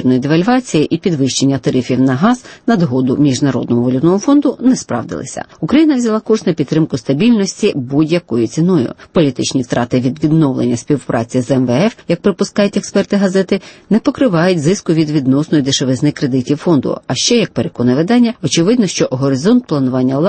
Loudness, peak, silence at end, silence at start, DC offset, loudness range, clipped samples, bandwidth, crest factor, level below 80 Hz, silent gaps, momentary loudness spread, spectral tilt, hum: -14 LUFS; 0 dBFS; 0 s; 0 s; under 0.1%; 1 LU; under 0.1%; 8.8 kHz; 12 dB; -48 dBFS; none; 5 LU; -5.5 dB/octave; none